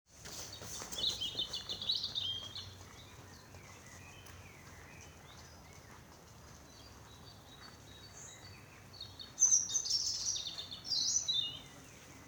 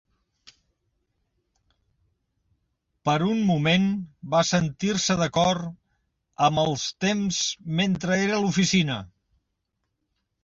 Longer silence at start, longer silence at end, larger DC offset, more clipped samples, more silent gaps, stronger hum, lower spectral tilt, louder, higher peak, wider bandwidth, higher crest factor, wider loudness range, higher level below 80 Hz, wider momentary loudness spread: second, 0.1 s vs 3.05 s; second, 0 s vs 1.35 s; neither; neither; neither; neither; second, 0 dB/octave vs -4.5 dB/octave; second, -34 LUFS vs -24 LUFS; second, -16 dBFS vs -8 dBFS; first, 19.5 kHz vs 8 kHz; first, 24 dB vs 18 dB; first, 21 LU vs 4 LU; second, -64 dBFS vs -56 dBFS; first, 23 LU vs 6 LU